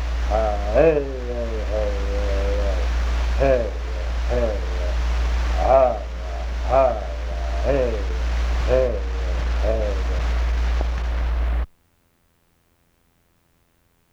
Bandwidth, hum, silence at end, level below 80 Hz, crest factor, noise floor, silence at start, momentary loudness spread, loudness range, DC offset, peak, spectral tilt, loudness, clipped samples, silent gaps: 7.6 kHz; none; 2.45 s; -24 dBFS; 18 dB; -63 dBFS; 0 s; 10 LU; 5 LU; under 0.1%; -4 dBFS; -6.5 dB/octave; -23 LUFS; under 0.1%; none